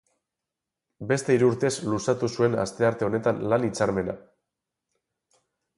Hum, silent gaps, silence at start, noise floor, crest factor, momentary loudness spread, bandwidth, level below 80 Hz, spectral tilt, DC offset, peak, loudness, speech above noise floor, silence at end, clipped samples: none; none; 1 s; -87 dBFS; 18 dB; 8 LU; 11.5 kHz; -58 dBFS; -6 dB/octave; under 0.1%; -8 dBFS; -25 LUFS; 62 dB; 1.6 s; under 0.1%